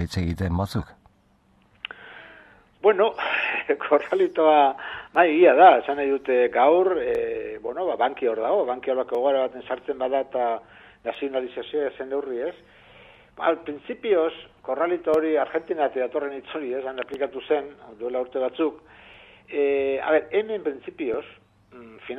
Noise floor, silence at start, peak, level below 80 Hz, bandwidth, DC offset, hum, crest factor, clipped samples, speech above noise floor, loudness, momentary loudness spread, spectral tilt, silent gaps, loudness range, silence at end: -61 dBFS; 0 s; -2 dBFS; -48 dBFS; 12.5 kHz; under 0.1%; none; 22 dB; under 0.1%; 38 dB; -23 LUFS; 14 LU; -7 dB/octave; none; 10 LU; 0 s